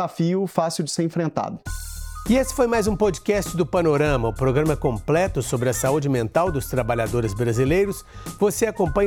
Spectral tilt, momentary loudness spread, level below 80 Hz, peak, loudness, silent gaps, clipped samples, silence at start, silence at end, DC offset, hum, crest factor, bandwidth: -6 dB/octave; 7 LU; -38 dBFS; -4 dBFS; -22 LUFS; none; under 0.1%; 0 s; 0 s; under 0.1%; none; 18 dB; 20 kHz